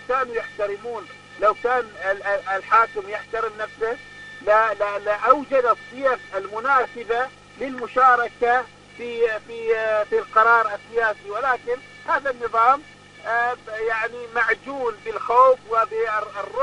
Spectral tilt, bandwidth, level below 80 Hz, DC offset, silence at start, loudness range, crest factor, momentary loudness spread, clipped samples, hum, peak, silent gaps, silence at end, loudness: -4 dB/octave; 10.5 kHz; -58 dBFS; under 0.1%; 0 s; 2 LU; 22 dB; 13 LU; under 0.1%; 50 Hz at -55 dBFS; 0 dBFS; none; 0 s; -21 LUFS